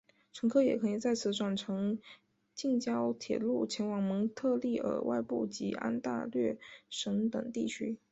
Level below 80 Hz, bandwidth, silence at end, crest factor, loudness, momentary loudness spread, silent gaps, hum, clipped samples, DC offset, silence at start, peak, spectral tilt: -74 dBFS; 8.2 kHz; 0.15 s; 18 dB; -34 LUFS; 7 LU; none; none; under 0.1%; under 0.1%; 0.35 s; -16 dBFS; -5.5 dB/octave